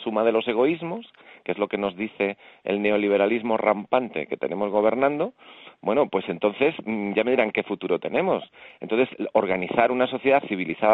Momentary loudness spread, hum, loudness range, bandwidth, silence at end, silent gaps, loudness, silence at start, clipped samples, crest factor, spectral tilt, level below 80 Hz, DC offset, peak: 8 LU; none; 1 LU; 4.6 kHz; 0 s; none; -24 LUFS; 0 s; under 0.1%; 20 dB; -8.5 dB/octave; -64 dBFS; under 0.1%; -4 dBFS